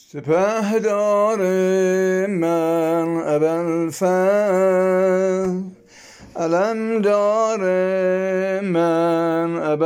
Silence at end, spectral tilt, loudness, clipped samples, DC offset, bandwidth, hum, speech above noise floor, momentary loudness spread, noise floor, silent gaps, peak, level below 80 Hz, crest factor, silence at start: 0 s; -6.5 dB/octave; -19 LUFS; under 0.1%; under 0.1%; 16.5 kHz; none; 27 dB; 4 LU; -45 dBFS; none; -8 dBFS; -64 dBFS; 12 dB; 0.15 s